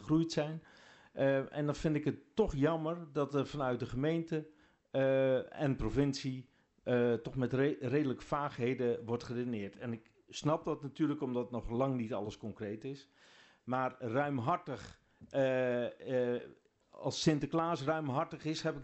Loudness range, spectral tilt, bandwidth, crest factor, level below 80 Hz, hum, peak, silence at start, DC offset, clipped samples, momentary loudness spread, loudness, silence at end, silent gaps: 4 LU; -6.5 dB/octave; 8.2 kHz; 20 dB; -58 dBFS; none; -16 dBFS; 0 s; under 0.1%; under 0.1%; 11 LU; -36 LUFS; 0 s; none